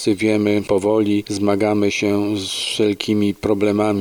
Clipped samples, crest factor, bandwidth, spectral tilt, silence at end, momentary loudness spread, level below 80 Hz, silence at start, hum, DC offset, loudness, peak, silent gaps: under 0.1%; 16 dB; 17.5 kHz; -5 dB/octave; 0 s; 3 LU; -52 dBFS; 0 s; none; under 0.1%; -18 LUFS; -2 dBFS; none